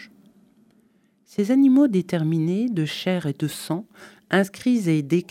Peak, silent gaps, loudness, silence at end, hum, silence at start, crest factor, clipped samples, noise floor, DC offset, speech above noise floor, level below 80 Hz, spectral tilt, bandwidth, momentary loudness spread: -6 dBFS; none; -22 LUFS; 0.1 s; none; 0 s; 16 dB; under 0.1%; -61 dBFS; under 0.1%; 40 dB; -70 dBFS; -6.5 dB/octave; 15.5 kHz; 12 LU